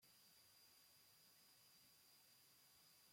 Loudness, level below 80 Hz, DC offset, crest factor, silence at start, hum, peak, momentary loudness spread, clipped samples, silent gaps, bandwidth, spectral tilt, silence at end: -69 LUFS; under -90 dBFS; under 0.1%; 14 dB; 0 s; none; -58 dBFS; 1 LU; under 0.1%; none; 16.5 kHz; -0.5 dB/octave; 0 s